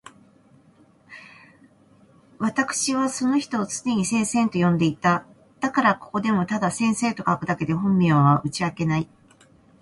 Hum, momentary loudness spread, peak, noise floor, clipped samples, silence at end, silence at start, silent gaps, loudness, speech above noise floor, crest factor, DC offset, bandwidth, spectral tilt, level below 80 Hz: none; 7 LU; -4 dBFS; -56 dBFS; under 0.1%; 0.75 s; 1.1 s; none; -22 LUFS; 34 dB; 18 dB; under 0.1%; 11.5 kHz; -5.5 dB/octave; -58 dBFS